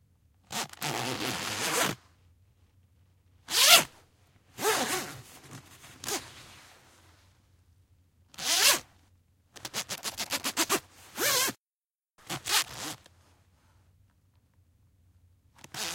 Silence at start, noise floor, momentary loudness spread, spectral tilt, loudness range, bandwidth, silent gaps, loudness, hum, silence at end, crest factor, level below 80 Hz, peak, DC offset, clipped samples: 0.5 s; under -90 dBFS; 23 LU; -0.5 dB/octave; 10 LU; 17 kHz; 11.58-11.66 s, 11.73-11.90 s; -27 LUFS; none; 0 s; 30 dB; -68 dBFS; -4 dBFS; under 0.1%; under 0.1%